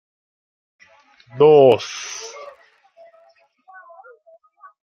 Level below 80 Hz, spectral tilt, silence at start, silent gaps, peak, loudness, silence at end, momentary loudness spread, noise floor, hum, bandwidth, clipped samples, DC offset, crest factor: -68 dBFS; -5 dB/octave; 1.35 s; none; -2 dBFS; -15 LUFS; 2.55 s; 23 LU; -56 dBFS; none; 7.2 kHz; under 0.1%; under 0.1%; 20 dB